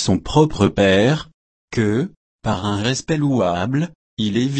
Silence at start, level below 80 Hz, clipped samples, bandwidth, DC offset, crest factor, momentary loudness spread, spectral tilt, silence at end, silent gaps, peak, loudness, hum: 0 s; -42 dBFS; under 0.1%; 8.8 kHz; under 0.1%; 16 dB; 10 LU; -6 dB/octave; 0 s; 1.34-1.68 s, 2.17-2.38 s, 3.95-4.17 s; -2 dBFS; -19 LUFS; none